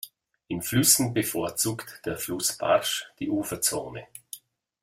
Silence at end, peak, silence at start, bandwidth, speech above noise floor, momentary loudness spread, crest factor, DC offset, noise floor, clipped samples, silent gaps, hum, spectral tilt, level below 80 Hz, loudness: 0.45 s; -6 dBFS; 0.05 s; 16.5 kHz; 21 dB; 22 LU; 22 dB; under 0.1%; -47 dBFS; under 0.1%; none; none; -3 dB/octave; -60 dBFS; -25 LUFS